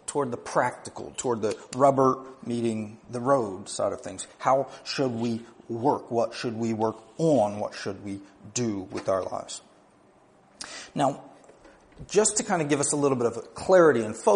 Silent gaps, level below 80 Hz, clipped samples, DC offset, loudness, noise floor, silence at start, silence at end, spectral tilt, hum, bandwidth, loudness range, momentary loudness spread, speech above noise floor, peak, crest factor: none; -64 dBFS; under 0.1%; under 0.1%; -26 LUFS; -58 dBFS; 0.1 s; 0 s; -4.5 dB/octave; none; 10.5 kHz; 6 LU; 14 LU; 32 dB; -6 dBFS; 20 dB